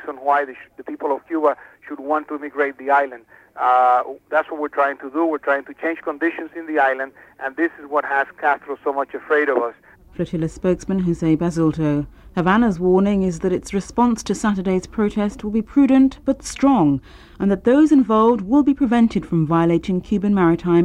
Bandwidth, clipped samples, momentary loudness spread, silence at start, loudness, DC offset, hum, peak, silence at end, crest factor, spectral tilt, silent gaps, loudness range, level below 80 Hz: 11.5 kHz; under 0.1%; 10 LU; 0 s; -19 LUFS; under 0.1%; none; -4 dBFS; 0 s; 14 dB; -7 dB/octave; none; 5 LU; -46 dBFS